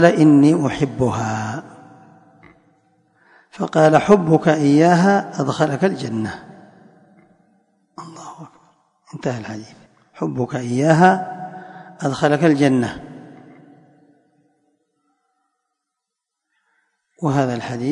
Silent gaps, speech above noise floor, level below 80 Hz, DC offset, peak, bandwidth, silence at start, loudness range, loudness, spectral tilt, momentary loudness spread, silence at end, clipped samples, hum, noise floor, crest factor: none; 65 dB; -56 dBFS; under 0.1%; 0 dBFS; 10.5 kHz; 0 s; 17 LU; -17 LUFS; -7 dB/octave; 23 LU; 0 s; under 0.1%; none; -81 dBFS; 20 dB